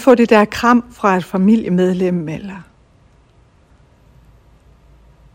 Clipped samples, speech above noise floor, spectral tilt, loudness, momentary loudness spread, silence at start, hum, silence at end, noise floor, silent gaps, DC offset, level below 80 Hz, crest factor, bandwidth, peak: under 0.1%; 37 dB; -7 dB/octave; -14 LUFS; 17 LU; 0 s; none; 2.75 s; -51 dBFS; none; under 0.1%; -48 dBFS; 16 dB; 16 kHz; 0 dBFS